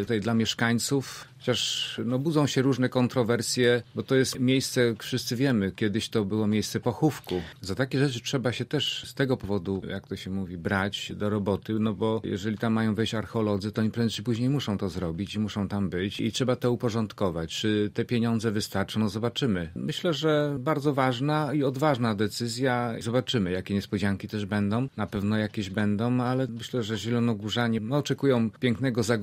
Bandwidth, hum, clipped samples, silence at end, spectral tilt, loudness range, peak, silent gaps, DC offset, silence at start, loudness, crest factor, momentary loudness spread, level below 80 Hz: 16 kHz; none; under 0.1%; 0 s; -5.5 dB/octave; 3 LU; -8 dBFS; none; under 0.1%; 0 s; -27 LUFS; 18 dB; 6 LU; -58 dBFS